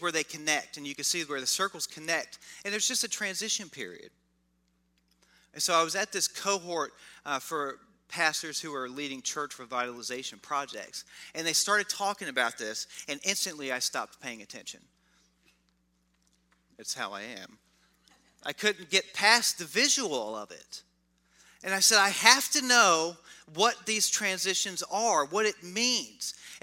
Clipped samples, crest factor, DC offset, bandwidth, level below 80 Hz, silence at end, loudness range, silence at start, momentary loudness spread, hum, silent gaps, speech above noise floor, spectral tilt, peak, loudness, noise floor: under 0.1%; 28 dB; under 0.1%; 16 kHz; -78 dBFS; 0.05 s; 13 LU; 0 s; 19 LU; none; none; 42 dB; -0.5 dB/octave; -2 dBFS; -28 LUFS; -72 dBFS